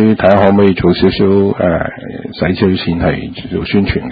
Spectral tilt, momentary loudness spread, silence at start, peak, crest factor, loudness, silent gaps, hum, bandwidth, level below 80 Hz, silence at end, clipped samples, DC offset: -9.5 dB/octave; 12 LU; 0 s; 0 dBFS; 12 dB; -12 LUFS; none; none; 5 kHz; -30 dBFS; 0 s; 0.1%; under 0.1%